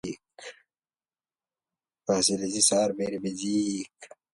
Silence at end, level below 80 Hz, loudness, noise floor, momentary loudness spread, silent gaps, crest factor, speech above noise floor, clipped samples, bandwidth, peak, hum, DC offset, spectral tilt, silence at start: 0.3 s; -66 dBFS; -26 LUFS; under -90 dBFS; 22 LU; none; 22 dB; over 63 dB; under 0.1%; 11.5 kHz; -8 dBFS; none; under 0.1%; -3 dB/octave; 0.05 s